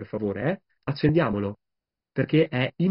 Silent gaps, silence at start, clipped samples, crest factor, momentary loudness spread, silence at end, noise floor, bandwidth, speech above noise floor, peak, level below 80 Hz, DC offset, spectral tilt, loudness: none; 0 s; under 0.1%; 18 dB; 11 LU; 0 s; -86 dBFS; 5.6 kHz; 62 dB; -8 dBFS; -54 dBFS; under 0.1%; -6.5 dB/octave; -26 LUFS